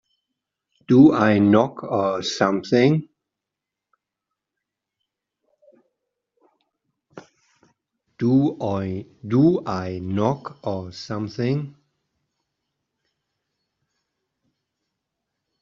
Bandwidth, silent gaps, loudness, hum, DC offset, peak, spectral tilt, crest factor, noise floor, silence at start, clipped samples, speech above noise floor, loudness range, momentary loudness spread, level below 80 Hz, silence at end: 7.6 kHz; none; -21 LUFS; none; under 0.1%; -2 dBFS; -6.5 dB/octave; 20 dB; -85 dBFS; 0.9 s; under 0.1%; 66 dB; 13 LU; 15 LU; -64 dBFS; 3.9 s